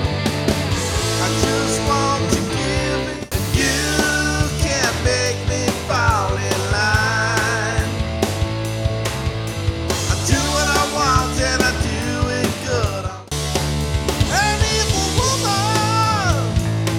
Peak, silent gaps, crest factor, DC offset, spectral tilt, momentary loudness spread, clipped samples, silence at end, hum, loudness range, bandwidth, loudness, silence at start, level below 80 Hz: -2 dBFS; none; 18 dB; under 0.1%; -4 dB/octave; 6 LU; under 0.1%; 0 s; none; 2 LU; 17.5 kHz; -19 LUFS; 0 s; -28 dBFS